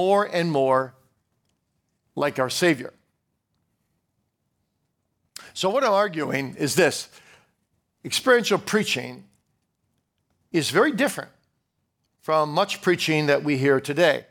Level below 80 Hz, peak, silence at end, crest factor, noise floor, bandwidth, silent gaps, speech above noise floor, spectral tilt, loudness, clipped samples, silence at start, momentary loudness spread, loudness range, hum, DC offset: -72 dBFS; -4 dBFS; 0.1 s; 20 dB; -75 dBFS; 19 kHz; none; 53 dB; -4 dB/octave; -22 LUFS; under 0.1%; 0 s; 17 LU; 5 LU; none; under 0.1%